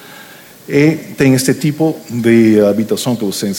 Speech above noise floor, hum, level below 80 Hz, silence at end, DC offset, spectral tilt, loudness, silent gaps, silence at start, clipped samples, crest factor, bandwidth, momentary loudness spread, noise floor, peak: 25 dB; none; -50 dBFS; 0 s; under 0.1%; -5.5 dB/octave; -13 LUFS; none; 0.05 s; under 0.1%; 12 dB; 18 kHz; 8 LU; -37 dBFS; 0 dBFS